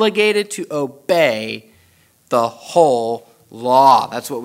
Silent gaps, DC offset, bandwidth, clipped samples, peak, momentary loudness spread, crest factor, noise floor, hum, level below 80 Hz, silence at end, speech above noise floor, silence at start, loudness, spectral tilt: none; under 0.1%; 16 kHz; under 0.1%; 0 dBFS; 13 LU; 16 dB; -54 dBFS; none; -68 dBFS; 0 s; 38 dB; 0 s; -16 LUFS; -4 dB/octave